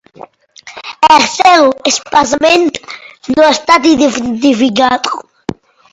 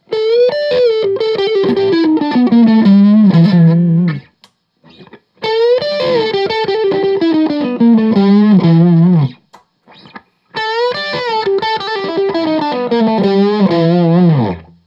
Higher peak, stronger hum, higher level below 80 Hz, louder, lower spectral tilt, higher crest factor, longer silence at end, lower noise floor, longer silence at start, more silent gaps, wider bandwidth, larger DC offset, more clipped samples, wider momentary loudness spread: about the same, 0 dBFS vs 0 dBFS; neither; first, -48 dBFS vs -58 dBFS; about the same, -9 LUFS vs -11 LUFS; second, -2.5 dB/octave vs -9 dB/octave; about the same, 12 dB vs 12 dB; first, 0.75 s vs 0.25 s; second, -37 dBFS vs -51 dBFS; about the same, 0.2 s vs 0.1 s; neither; first, 11 kHz vs 6.8 kHz; neither; first, 0.4% vs under 0.1%; first, 18 LU vs 8 LU